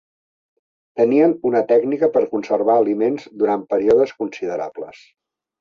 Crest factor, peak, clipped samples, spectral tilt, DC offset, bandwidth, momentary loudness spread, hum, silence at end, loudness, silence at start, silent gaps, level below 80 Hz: 16 dB; -4 dBFS; under 0.1%; -7.5 dB/octave; under 0.1%; 7 kHz; 11 LU; none; 0.7 s; -18 LUFS; 0.95 s; none; -62 dBFS